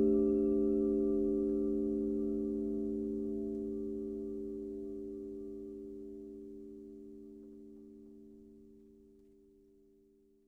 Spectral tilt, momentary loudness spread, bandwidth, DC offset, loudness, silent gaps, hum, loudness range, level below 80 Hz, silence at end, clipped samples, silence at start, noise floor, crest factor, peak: -11 dB/octave; 23 LU; 1.5 kHz; under 0.1%; -36 LUFS; none; none; 21 LU; -58 dBFS; 1.6 s; under 0.1%; 0 s; -67 dBFS; 16 dB; -20 dBFS